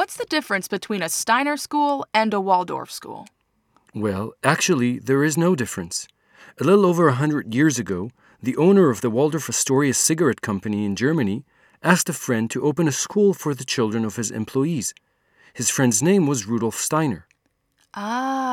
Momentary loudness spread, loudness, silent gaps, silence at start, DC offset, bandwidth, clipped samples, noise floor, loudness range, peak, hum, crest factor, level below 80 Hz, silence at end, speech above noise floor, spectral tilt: 11 LU; -21 LUFS; none; 0 s; under 0.1%; 18 kHz; under 0.1%; -68 dBFS; 3 LU; 0 dBFS; none; 22 dB; -64 dBFS; 0 s; 47 dB; -4.5 dB/octave